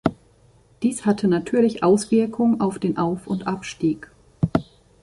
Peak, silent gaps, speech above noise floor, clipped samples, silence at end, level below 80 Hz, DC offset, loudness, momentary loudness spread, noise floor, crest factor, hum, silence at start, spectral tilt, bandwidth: -2 dBFS; none; 34 dB; under 0.1%; 0.4 s; -50 dBFS; under 0.1%; -22 LUFS; 8 LU; -55 dBFS; 20 dB; none; 0.05 s; -6.5 dB/octave; 11.5 kHz